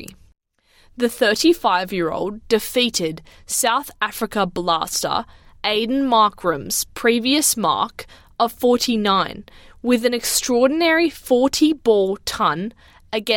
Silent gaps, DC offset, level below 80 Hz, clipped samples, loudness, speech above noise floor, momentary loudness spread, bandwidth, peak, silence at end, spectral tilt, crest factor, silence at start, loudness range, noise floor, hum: none; under 0.1%; -50 dBFS; under 0.1%; -19 LUFS; 36 dB; 10 LU; 17.5 kHz; -4 dBFS; 0 s; -3 dB/octave; 16 dB; 0 s; 3 LU; -55 dBFS; none